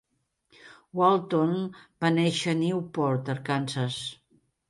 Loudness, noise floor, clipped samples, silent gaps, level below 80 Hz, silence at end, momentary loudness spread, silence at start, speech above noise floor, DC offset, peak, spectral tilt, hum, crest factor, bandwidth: -27 LUFS; -71 dBFS; under 0.1%; none; -70 dBFS; 0.55 s; 11 LU; 0.65 s; 45 dB; under 0.1%; -8 dBFS; -6 dB/octave; none; 20 dB; 11.5 kHz